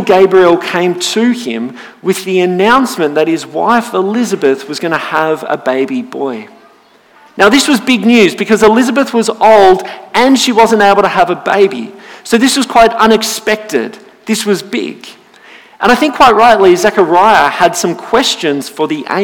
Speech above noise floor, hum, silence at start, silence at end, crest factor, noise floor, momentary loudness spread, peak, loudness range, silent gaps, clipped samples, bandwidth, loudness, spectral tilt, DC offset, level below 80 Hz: 35 dB; none; 0 s; 0 s; 10 dB; -44 dBFS; 11 LU; 0 dBFS; 5 LU; none; 1%; 19 kHz; -10 LUFS; -4 dB/octave; under 0.1%; -44 dBFS